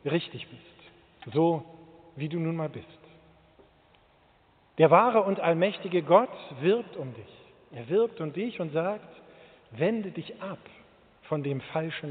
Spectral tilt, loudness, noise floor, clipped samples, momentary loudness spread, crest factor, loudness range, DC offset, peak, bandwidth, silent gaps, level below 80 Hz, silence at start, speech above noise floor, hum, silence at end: -5.5 dB/octave; -27 LUFS; -62 dBFS; under 0.1%; 21 LU; 22 dB; 9 LU; under 0.1%; -6 dBFS; 4.6 kHz; none; -72 dBFS; 0.05 s; 35 dB; none; 0 s